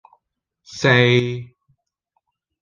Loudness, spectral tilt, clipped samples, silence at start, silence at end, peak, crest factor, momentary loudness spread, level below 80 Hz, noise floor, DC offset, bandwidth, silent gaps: -17 LUFS; -5.5 dB/octave; under 0.1%; 0.7 s; 1.15 s; -2 dBFS; 20 dB; 19 LU; -56 dBFS; -75 dBFS; under 0.1%; 7.4 kHz; none